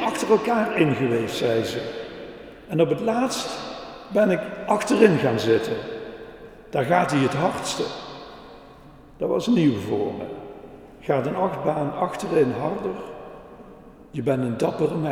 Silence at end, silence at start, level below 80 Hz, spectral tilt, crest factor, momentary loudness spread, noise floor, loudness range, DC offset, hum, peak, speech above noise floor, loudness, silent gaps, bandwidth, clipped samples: 0 s; 0 s; -54 dBFS; -6 dB/octave; 22 dB; 20 LU; -46 dBFS; 4 LU; under 0.1%; none; -2 dBFS; 24 dB; -23 LUFS; none; 16 kHz; under 0.1%